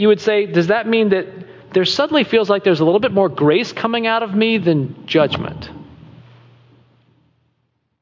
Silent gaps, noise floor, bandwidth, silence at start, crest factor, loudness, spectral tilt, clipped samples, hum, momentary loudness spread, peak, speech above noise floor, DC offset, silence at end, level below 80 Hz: none; -67 dBFS; 7.6 kHz; 0 s; 14 dB; -16 LUFS; -6 dB/octave; under 0.1%; none; 8 LU; -2 dBFS; 52 dB; under 0.1%; 2.05 s; -52 dBFS